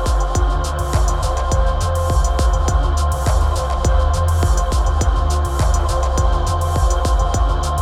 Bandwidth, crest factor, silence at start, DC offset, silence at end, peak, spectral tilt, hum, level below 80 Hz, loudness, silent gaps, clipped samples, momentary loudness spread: 14 kHz; 12 dB; 0 s; under 0.1%; 0 s; -4 dBFS; -5.5 dB/octave; none; -18 dBFS; -18 LUFS; none; under 0.1%; 2 LU